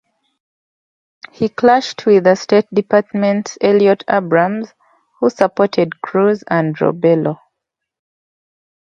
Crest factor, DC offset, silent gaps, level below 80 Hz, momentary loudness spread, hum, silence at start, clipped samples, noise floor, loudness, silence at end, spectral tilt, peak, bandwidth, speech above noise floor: 16 dB; under 0.1%; none; -62 dBFS; 7 LU; none; 1.4 s; under 0.1%; -79 dBFS; -15 LUFS; 1.5 s; -6.5 dB/octave; 0 dBFS; 7.4 kHz; 65 dB